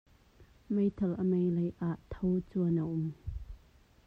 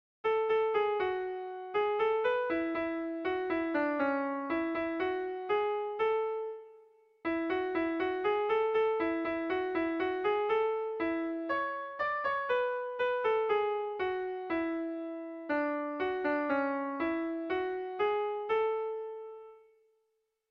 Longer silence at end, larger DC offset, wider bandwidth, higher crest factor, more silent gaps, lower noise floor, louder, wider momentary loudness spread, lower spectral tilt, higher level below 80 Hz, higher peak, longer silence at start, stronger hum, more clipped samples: second, 0.5 s vs 0.9 s; neither; second, 4 kHz vs 5.8 kHz; about the same, 14 dB vs 14 dB; neither; second, -62 dBFS vs -80 dBFS; about the same, -33 LUFS vs -33 LUFS; first, 15 LU vs 7 LU; first, -11 dB/octave vs -6.5 dB/octave; first, -52 dBFS vs -68 dBFS; about the same, -20 dBFS vs -20 dBFS; first, 0.4 s vs 0.25 s; neither; neither